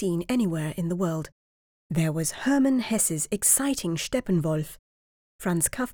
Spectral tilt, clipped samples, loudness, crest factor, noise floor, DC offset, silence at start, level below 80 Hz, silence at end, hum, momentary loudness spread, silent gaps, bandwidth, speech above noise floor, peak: -4.5 dB/octave; under 0.1%; -25 LUFS; 18 dB; under -90 dBFS; under 0.1%; 0 s; -52 dBFS; 0 s; none; 10 LU; 1.32-1.90 s, 4.79-5.39 s; over 20 kHz; over 64 dB; -8 dBFS